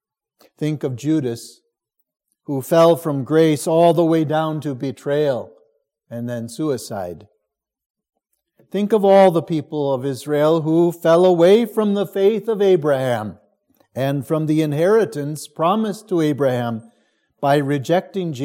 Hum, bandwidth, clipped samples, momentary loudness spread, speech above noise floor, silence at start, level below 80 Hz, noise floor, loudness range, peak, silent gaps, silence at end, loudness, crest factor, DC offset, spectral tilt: none; 17 kHz; under 0.1%; 13 LU; 60 dB; 0.6 s; -70 dBFS; -77 dBFS; 9 LU; -2 dBFS; 7.86-7.94 s; 0 s; -18 LUFS; 18 dB; under 0.1%; -6.5 dB/octave